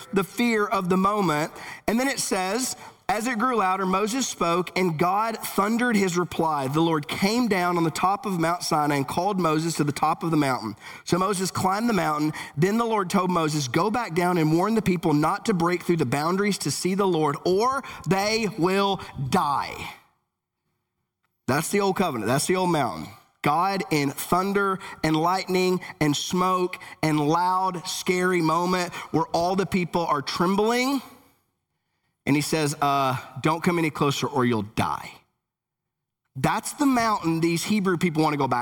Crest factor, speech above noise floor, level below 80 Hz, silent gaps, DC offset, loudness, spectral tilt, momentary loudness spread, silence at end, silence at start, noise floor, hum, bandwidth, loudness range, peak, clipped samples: 16 dB; 61 dB; -56 dBFS; none; under 0.1%; -24 LUFS; -5 dB/octave; 5 LU; 0 s; 0 s; -85 dBFS; none; 20 kHz; 3 LU; -8 dBFS; under 0.1%